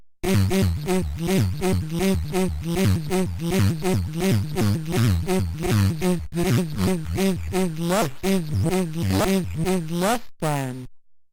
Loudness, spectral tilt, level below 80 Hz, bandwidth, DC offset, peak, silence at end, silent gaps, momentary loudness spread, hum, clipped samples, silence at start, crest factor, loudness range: -23 LUFS; -6 dB/octave; -40 dBFS; 18.5 kHz; under 0.1%; -10 dBFS; 0.15 s; none; 3 LU; none; under 0.1%; 0 s; 12 dB; 1 LU